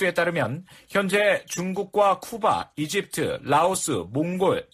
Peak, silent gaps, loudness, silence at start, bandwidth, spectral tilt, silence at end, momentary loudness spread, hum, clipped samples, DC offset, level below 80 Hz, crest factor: -8 dBFS; none; -24 LUFS; 0 s; 15 kHz; -4 dB/octave; 0.1 s; 7 LU; none; under 0.1%; under 0.1%; -60 dBFS; 16 dB